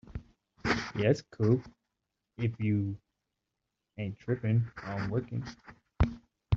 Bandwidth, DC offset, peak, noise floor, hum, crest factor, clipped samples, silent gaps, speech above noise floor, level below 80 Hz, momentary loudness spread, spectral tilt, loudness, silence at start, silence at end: 7.6 kHz; under 0.1%; -12 dBFS; -86 dBFS; none; 20 dB; under 0.1%; none; 55 dB; -46 dBFS; 17 LU; -7 dB/octave; -32 LUFS; 0.1 s; 0 s